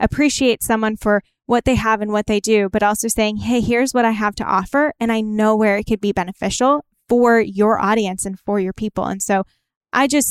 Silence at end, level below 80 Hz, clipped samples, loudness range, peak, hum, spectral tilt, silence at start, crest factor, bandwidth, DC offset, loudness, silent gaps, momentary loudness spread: 0 s; -40 dBFS; under 0.1%; 1 LU; -4 dBFS; none; -4.5 dB/octave; 0 s; 14 dB; 16 kHz; under 0.1%; -18 LUFS; 9.76-9.81 s; 6 LU